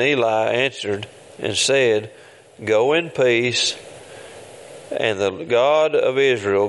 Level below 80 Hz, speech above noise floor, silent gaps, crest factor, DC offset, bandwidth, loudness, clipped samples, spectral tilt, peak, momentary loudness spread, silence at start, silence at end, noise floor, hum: -64 dBFS; 21 dB; none; 16 dB; under 0.1%; 11.5 kHz; -19 LUFS; under 0.1%; -3.5 dB/octave; -2 dBFS; 22 LU; 0 s; 0 s; -40 dBFS; none